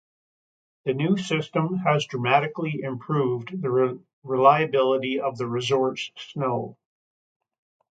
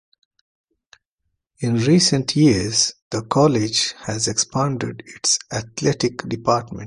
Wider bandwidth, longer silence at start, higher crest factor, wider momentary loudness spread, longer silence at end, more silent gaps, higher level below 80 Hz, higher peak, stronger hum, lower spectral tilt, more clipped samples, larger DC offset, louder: second, 9 kHz vs 11.5 kHz; second, 0.85 s vs 1.6 s; about the same, 22 dB vs 18 dB; about the same, 11 LU vs 9 LU; first, 1.15 s vs 0 s; about the same, 4.13-4.22 s vs 3.02-3.11 s; second, -70 dBFS vs -50 dBFS; about the same, -2 dBFS vs -2 dBFS; neither; first, -6 dB/octave vs -4 dB/octave; neither; neither; second, -24 LUFS vs -19 LUFS